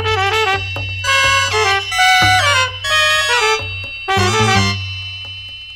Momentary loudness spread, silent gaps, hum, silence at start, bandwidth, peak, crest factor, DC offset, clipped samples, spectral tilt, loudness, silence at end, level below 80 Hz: 13 LU; none; none; 0 s; over 20 kHz; 0 dBFS; 14 dB; under 0.1%; under 0.1%; -2.5 dB/octave; -13 LUFS; 0 s; -40 dBFS